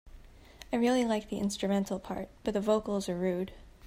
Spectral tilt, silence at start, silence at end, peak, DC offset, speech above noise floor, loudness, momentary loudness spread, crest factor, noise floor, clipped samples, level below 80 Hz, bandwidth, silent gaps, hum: -5.5 dB/octave; 0.05 s; 0 s; -14 dBFS; under 0.1%; 22 dB; -32 LUFS; 9 LU; 18 dB; -52 dBFS; under 0.1%; -56 dBFS; 15.5 kHz; none; none